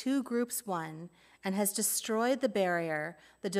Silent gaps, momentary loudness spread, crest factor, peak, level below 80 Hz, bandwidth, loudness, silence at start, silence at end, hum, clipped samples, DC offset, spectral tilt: none; 12 LU; 16 dB; -16 dBFS; -78 dBFS; 16 kHz; -32 LUFS; 0 s; 0 s; none; under 0.1%; under 0.1%; -3.5 dB/octave